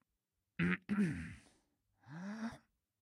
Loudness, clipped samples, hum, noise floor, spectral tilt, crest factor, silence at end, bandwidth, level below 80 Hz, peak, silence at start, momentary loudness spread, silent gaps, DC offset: -40 LUFS; under 0.1%; none; -89 dBFS; -7 dB/octave; 24 dB; 0.45 s; 11.5 kHz; -66 dBFS; -20 dBFS; 0.6 s; 19 LU; none; under 0.1%